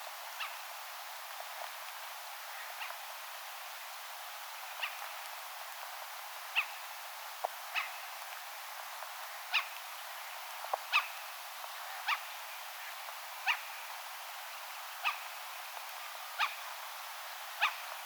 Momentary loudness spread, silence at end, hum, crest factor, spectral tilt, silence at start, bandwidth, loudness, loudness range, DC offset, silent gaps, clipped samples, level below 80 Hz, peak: 9 LU; 0 s; none; 24 dB; 7.5 dB/octave; 0 s; over 20 kHz; -40 LUFS; 5 LU; under 0.1%; none; under 0.1%; under -90 dBFS; -16 dBFS